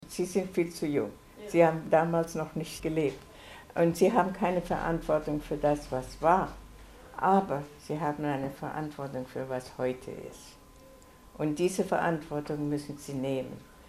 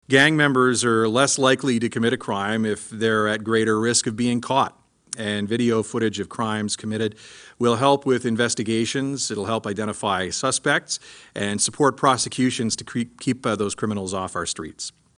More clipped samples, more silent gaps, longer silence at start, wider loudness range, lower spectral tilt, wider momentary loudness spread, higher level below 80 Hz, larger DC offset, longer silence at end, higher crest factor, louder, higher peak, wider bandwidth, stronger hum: neither; neither; about the same, 0 s vs 0.1 s; first, 7 LU vs 3 LU; first, -6.5 dB/octave vs -4 dB/octave; first, 13 LU vs 9 LU; first, -54 dBFS vs -60 dBFS; neither; second, 0 s vs 0.3 s; about the same, 22 dB vs 20 dB; second, -30 LUFS vs -22 LUFS; second, -8 dBFS vs -2 dBFS; first, 15.5 kHz vs 10.5 kHz; neither